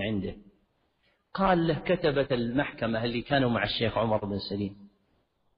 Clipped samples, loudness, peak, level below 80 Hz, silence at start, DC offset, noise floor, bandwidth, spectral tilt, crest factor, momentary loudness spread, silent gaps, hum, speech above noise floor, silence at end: under 0.1%; -28 LUFS; -10 dBFS; -52 dBFS; 0 s; under 0.1%; -71 dBFS; 5.2 kHz; -4.5 dB/octave; 20 dB; 9 LU; none; none; 44 dB; 0.7 s